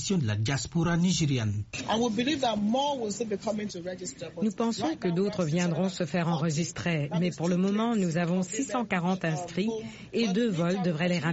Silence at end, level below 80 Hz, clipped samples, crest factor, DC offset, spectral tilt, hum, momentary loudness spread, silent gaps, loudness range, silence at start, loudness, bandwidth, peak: 0 s; -58 dBFS; under 0.1%; 14 dB; under 0.1%; -5.5 dB/octave; none; 6 LU; none; 2 LU; 0 s; -29 LUFS; 8 kHz; -14 dBFS